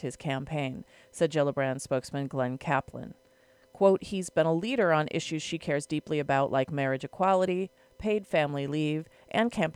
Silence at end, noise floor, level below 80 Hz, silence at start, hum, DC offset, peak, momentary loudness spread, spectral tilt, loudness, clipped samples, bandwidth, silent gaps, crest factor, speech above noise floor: 0.05 s; -62 dBFS; -62 dBFS; 0 s; none; under 0.1%; -10 dBFS; 9 LU; -6 dB/octave; -29 LUFS; under 0.1%; 13.5 kHz; none; 20 dB; 33 dB